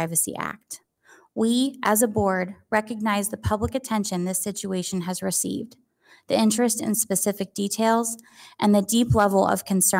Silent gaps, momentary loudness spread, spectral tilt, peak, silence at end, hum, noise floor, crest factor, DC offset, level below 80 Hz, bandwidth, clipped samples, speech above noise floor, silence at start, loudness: none; 10 LU; -4 dB/octave; -8 dBFS; 0 s; none; -56 dBFS; 16 dB; under 0.1%; -48 dBFS; 16.5 kHz; under 0.1%; 33 dB; 0 s; -23 LUFS